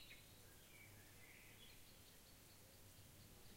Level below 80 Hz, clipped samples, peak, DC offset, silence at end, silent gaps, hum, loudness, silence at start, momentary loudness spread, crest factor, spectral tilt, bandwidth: -74 dBFS; under 0.1%; -48 dBFS; under 0.1%; 0 s; none; none; -63 LUFS; 0 s; 2 LU; 16 dB; -3 dB/octave; 16 kHz